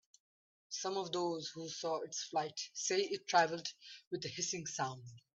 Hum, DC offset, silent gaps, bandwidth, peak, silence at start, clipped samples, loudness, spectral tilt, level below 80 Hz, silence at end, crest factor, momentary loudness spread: none; under 0.1%; 4.07-4.11 s; 8.4 kHz; -18 dBFS; 0.7 s; under 0.1%; -38 LUFS; -2.5 dB/octave; -82 dBFS; 0.2 s; 22 dB; 12 LU